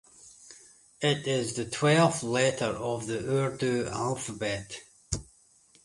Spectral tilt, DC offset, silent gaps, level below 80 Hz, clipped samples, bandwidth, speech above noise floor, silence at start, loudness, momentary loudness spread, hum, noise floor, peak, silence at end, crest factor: -4.5 dB/octave; under 0.1%; none; -56 dBFS; under 0.1%; 11.5 kHz; 33 dB; 0.25 s; -29 LUFS; 14 LU; none; -61 dBFS; -10 dBFS; 0.6 s; 20 dB